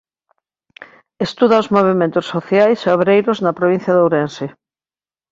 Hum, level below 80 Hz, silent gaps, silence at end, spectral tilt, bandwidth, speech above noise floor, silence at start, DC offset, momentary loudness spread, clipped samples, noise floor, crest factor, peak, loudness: none; -58 dBFS; none; 0.8 s; -7 dB/octave; 7.8 kHz; over 76 dB; 0.8 s; under 0.1%; 11 LU; under 0.1%; under -90 dBFS; 16 dB; 0 dBFS; -15 LUFS